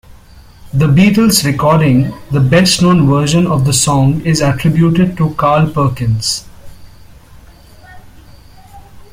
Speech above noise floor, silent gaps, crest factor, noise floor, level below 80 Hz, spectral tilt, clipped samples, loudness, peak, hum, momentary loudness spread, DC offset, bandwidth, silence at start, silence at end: 28 dB; none; 12 dB; -38 dBFS; -36 dBFS; -5.5 dB/octave; under 0.1%; -11 LUFS; 0 dBFS; none; 6 LU; under 0.1%; 16 kHz; 0.1 s; 0.05 s